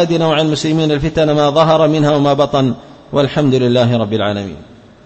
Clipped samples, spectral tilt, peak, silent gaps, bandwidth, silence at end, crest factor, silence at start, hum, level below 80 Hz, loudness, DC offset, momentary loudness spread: under 0.1%; -6.5 dB/octave; 0 dBFS; none; 8.6 kHz; 0.45 s; 14 dB; 0 s; none; -40 dBFS; -13 LUFS; under 0.1%; 8 LU